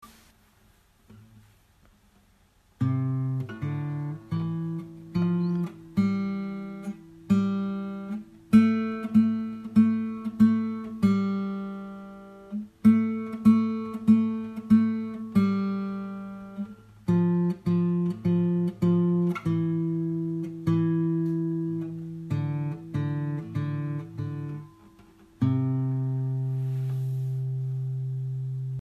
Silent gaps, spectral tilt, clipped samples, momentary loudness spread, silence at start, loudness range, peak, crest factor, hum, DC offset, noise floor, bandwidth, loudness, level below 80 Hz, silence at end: none; -9.5 dB/octave; under 0.1%; 14 LU; 0.05 s; 8 LU; -8 dBFS; 18 dB; none; under 0.1%; -62 dBFS; 7.2 kHz; -27 LUFS; -60 dBFS; 0 s